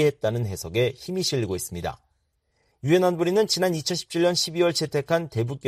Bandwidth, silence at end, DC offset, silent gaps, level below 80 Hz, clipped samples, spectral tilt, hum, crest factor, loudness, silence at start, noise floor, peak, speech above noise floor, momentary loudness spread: 15.5 kHz; 0 s; under 0.1%; none; -56 dBFS; under 0.1%; -4.5 dB/octave; none; 16 dB; -24 LUFS; 0 s; -71 dBFS; -8 dBFS; 47 dB; 8 LU